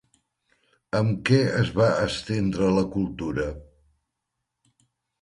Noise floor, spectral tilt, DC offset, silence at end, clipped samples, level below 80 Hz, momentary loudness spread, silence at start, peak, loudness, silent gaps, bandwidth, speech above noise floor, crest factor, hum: -82 dBFS; -6.5 dB/octave; under 0.1%; 1.6 s; under 0.1%; -48 dBFS; 8 LU; 0.95 s; -8 dBFS; -24 LUFS; none; 11.5 kHz; 59 dB; 18 dB; none